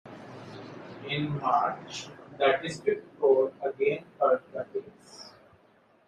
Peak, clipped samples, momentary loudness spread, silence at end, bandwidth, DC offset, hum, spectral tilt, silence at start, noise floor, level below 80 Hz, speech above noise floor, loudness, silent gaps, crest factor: -10 dBFS; under 0.1%; 20 LU; 0.8 s; 9.6 kHz; under 0.1%; none; -5.5 dB/octave; 0.05 s; -62 dBFS; -72 dBFS; 34 dB; -29 LUFS; none; 20 dB